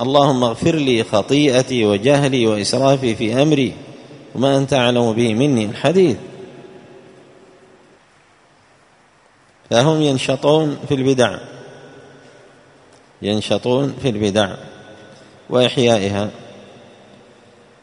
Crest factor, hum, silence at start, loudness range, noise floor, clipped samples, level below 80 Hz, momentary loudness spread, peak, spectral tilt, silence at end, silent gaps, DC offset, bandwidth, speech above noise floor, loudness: 18 dB; none; 0 s; 6 LU; -52 dBFS; under 0.1%; -54 dBFS; 15 LU; 0 dBFS; -5.5 dB/octave; 1.15 s; none; under 0.1%; 11 kHz; 37 dB; -16 LUFS